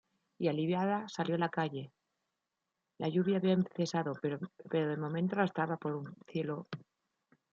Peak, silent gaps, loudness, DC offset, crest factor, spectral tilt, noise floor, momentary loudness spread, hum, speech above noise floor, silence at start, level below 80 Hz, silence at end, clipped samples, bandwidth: -16 dBFS; none; -35 LUFS; under 0.1%; 20 dB; -7 dB/octave; -88 dBFS; 11 LU; none; 53 dB; 0.4 s; -80 dBFS; 0.7 s; under 0.1%; 7.4 kHz